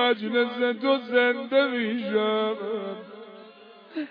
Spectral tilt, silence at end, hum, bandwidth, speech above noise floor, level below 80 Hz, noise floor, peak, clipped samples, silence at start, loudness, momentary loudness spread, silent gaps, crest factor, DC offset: -7.5 dB/octave; 0 s; none; 5.2 kHz; 24 dB; under -90 dBFS; -49 dBFS; -8 dBFS; under 0.1%; 0 s; -25 LUFS; 17 LU; none; 16 dB; under 0.1%